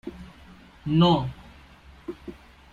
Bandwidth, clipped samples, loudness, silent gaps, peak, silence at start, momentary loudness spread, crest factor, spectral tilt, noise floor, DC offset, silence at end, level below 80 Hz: 7.2 kHz; under 0.1%; -23 LUFS; none; -8 dBFS; 0.05 s; 26 LU; 20 dB; -8 dB/octave; -50 dBFS; under 0.1%; 0.4 s; -50 dBFS